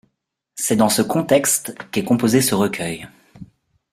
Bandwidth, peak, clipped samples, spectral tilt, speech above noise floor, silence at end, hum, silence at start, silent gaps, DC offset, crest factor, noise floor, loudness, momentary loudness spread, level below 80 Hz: 16 kHz; -2 dBFS; under 0.1%; -4 dB/octave; 55 dB; 0.5 s; none; 0.55 s; none; under 0.1%; 18 dB; -73 dBFS; -18 LUFS; 11 LU; -56 dBFS